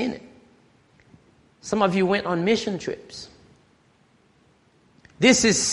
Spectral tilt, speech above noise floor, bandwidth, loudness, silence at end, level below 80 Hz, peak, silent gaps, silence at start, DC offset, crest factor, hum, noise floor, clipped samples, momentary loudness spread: -3.5 dB/octave; 39 dB; 11.5 kHz; -21 LUFS; 0 s; -58 dBFS; -2 dBFS; none; 0 s; under 0.1%; 22 dB; none; -60 dBFS; under 0.1%; 23 LU